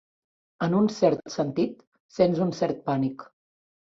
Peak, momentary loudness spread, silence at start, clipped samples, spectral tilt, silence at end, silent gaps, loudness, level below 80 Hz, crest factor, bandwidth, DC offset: -8 dBFS; 8 LU; 0.6 s; under 0.1%; -7 dB/octave; 0.7 s; 1.87-1.92 s, 2.00-2.09 s; -26 LUFS; -64 dBFS; 20 dB; 7.8 kHz; under 0.1%